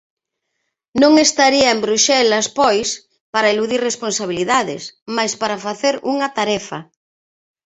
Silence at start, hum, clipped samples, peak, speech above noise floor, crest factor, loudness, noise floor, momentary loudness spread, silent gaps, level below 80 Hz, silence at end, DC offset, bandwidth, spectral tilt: 0.95 s; none; under 0.1%; 0 dBFS; 58 dB; 18 dB; -16 LUFS; -75 dBFS; 12 LU; 3.21-3.33 s, 5.02-5.06 s; -58 dBFS; 0.85 s; under 0.1%; 8.4 kHz; -2 dB/octave